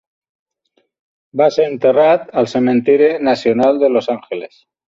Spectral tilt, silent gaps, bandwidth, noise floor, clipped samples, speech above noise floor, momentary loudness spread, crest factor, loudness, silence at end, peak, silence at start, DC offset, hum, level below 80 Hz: -6.5 dB/octave; none; 7.6 kHz; -64 dBFS; under 0.1%; 50 dB; 11 LU; 14 dB; -14 LUFS; 0.4 s; -2 dBFS; 1.35 s; under 0.1%; none; -60 dBFS